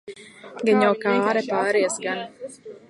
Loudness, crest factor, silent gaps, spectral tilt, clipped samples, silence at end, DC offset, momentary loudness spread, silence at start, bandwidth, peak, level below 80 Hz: -22 LUFS; 18 dB; none; -4.5 dB/octave; under 0.1%; 0.1 s; under 0.1%; 21 LU; 0.05 s; 11.5 kHz; -6 dBFS; -74 dBFS